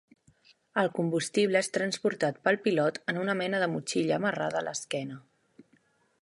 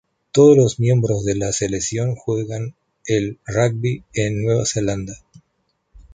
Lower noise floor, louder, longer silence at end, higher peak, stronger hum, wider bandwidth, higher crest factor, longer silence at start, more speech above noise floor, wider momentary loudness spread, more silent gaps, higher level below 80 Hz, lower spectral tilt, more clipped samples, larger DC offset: about the same, -68 dBFS vs -69 dBFS; second, -29 LUFS vs -19 LUFS; first, 1 s vs 0.15 s; second, -12 dBFS vs -2 dBFS; neither; first, 11.5 kHz vs 9.6 kHz; about the same, 20 dB vs 18 dB; first, 0.75 s vs 0.35 s; second, 39 dB vs 51 dB; second, 8 LU vs 14 LU; neither; second, -76 dBFS vs -46 dBFS; second, -4.5 dB/octave vs -6 dB/octave; neither; neither